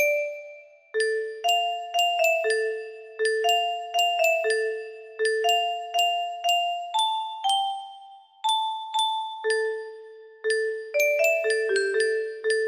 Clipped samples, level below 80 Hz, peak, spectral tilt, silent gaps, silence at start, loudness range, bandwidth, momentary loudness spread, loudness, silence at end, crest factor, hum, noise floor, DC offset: under 0.1%; -78 dBFS; -10 dBFS; 1 dB/octave; none; 0 s; 3 LU; 15.5 kHz; 11 LU; -25 LUFS; 0 s; 16 dB; none; -48 dBFS; under 0.1%